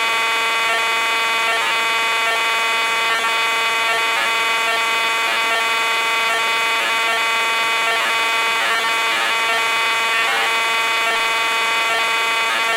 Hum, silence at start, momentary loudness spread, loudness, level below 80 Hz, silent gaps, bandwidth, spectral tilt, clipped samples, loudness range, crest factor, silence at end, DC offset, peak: none; 0 s; 0 LU; -16 LUFS; -70 dBFS; none; 16 kHz; 1 dB/octave; under 0.1%; 0 LU; 12 dB; 0 s; under 0.1%; -6 dBFS